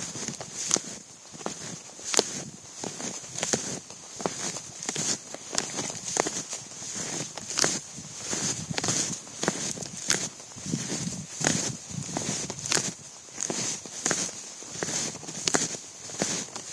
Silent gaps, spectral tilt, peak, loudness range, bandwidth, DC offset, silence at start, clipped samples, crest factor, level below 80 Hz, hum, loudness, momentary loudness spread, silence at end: none; -2 dB/octave; 0 dBFS; 2 LU; 11 kHz; under 0.1%; 0 s; under 0.1%; 32 dB; -64 dBFS; none; -30 LUFS; 11 LU; 0 s